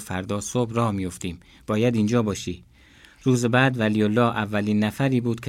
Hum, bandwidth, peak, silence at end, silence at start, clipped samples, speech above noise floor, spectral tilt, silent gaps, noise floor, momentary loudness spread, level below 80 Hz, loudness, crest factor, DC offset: none; 16 kHz; -6 dBFS; 0 s; 0 s; under 0.1%; 29 dB; -6 dB/octave; none; -52 dBFS; 12 LU; -56 dBFS; -23 LUFS; 18 dB; under 0.1%